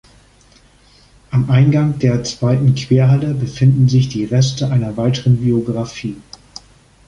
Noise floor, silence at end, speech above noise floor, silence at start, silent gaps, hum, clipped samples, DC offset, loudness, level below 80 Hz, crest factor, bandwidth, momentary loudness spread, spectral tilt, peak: -49 dBFS; 0.85 s; 35 dB; 1.3 s; none; none; under 0.1%; under 0.1%; -15 LUFS; -44 dBFS; 14 dB; 7.6 kHz; 11 LU; -7 dB/octave; -2 dBFS